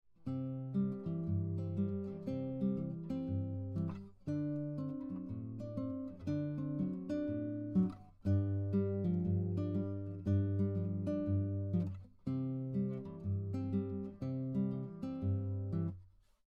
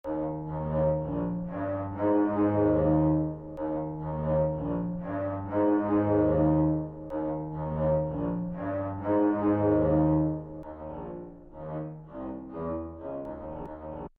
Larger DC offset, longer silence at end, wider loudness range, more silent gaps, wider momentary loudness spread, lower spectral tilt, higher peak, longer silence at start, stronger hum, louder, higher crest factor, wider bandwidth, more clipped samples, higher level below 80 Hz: neither; first, 0.4 s vs 0.1 s; about the same, 5 LU vs 6 LU; neither; second, 7 LU vs 15 LU; about the same, -11 dB/octave vs -10.5 dB/octave; second, -22 dBFS vs -14 dBFS; first, 0.2 s vs 0.05 s; neither; second, -39 LUFS vs -28 LUFS; about the same, 16 dB vs 16 dB; first, 4.7 kHz vs 3.3 kHz; neither; second, -66 dBFS vs -46 dBFS